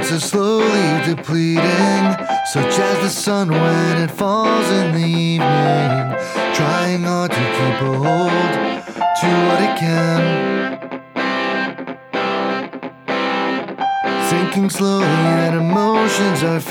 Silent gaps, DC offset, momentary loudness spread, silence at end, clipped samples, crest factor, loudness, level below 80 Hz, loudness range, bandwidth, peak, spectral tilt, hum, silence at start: none; under 0.1%; 6 LU; 0 s; under 0.1%; 14 dB; -17 LUFS; -60 dBFS; 4 LU; 18 kHz; -2 dBFS; -5.5 dB/octave; none; 0 s